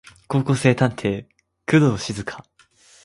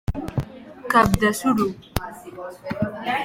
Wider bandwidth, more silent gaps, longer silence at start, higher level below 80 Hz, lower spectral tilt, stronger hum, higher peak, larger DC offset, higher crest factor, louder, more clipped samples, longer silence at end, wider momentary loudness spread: second, 11.5 kHz vs 16.5 kHz; neither; first, 0.3 s vs 0.1 s; second, -52 dBFS vs -38 dBFS; about the same, -6.5 dB/octave vs -5.5 dB/octave; neither; about the same, -2 dBFS vs 0 dBFS; neither; about the same, 20 dB vs 24 dB; about the same, -21 LUFS vs -22 LUFS; neither; first, 0.65 s vs 0 s; second, 16 LU vs 19 LU